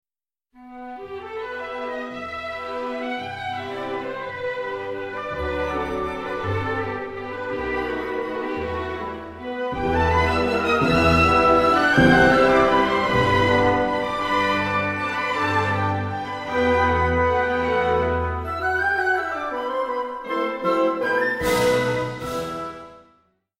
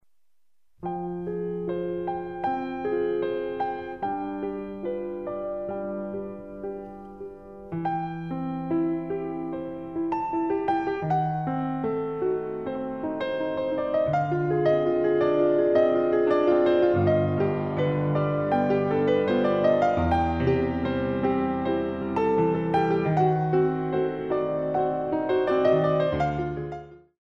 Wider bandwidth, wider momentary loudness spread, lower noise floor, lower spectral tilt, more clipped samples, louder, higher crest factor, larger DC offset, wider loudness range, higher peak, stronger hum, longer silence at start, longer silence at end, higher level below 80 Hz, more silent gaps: first, 16 kHz vs 6.6 kHz; first, 14 LU vs 11 LU; about the same, -87 dBFS vs -84 dBFS; second, -6 dB/octave vs -9 dB/octave; neither; first, -22 LUFS vs -26 LUFS; about the same, 18 dB vs 16 dB; second, under 0.1% vs 0.1%; first, 12 LU vs 9 LU; first, -4 dBFS vs -10 dBFS; neither; second, 0.6 s vs 0.8 s; first, 0.6 s vs 0.25 s; first, -40 dBFS vs -50 dBFS; neither